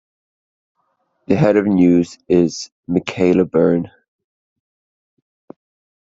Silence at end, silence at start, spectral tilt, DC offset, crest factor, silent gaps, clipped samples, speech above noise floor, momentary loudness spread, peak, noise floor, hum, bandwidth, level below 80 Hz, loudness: 2.15 s; 1.3 s; -7 dB/octave; under 0.1%; 18 dB; 2.72-2.83 s; under 0.1%; 52 dB; 8 LU; -2 dBFS; -67 dBFS; none; 7.8 kHz; -54 dBFS; -16 LUFS